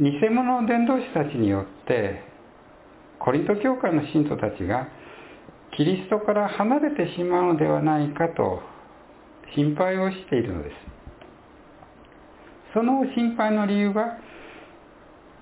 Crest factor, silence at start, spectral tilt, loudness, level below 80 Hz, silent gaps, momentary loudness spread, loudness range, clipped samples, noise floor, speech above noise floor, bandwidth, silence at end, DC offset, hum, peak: 18 dB; 0 s; -11 dB/octave; -24 LUFS; -52 dBFS; none; 17 LU; 5 LU; under 0.1%; -49 dBFS; 27 dB; 4 kHz; 0.65 s; under 0.1%; none; -6 dBFS